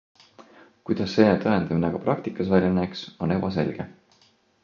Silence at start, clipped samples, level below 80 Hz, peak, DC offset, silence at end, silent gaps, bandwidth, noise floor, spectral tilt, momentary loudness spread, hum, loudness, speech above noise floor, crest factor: 0.4 s; under 0.1%; -50 dBFS; -4 dBFS; under 0.1%; 0.7 s; none; 7 kHz; -61 dBFS; -8 dB/octave; 11 LU; none; -24 LUFS; 38 dB; 22 dB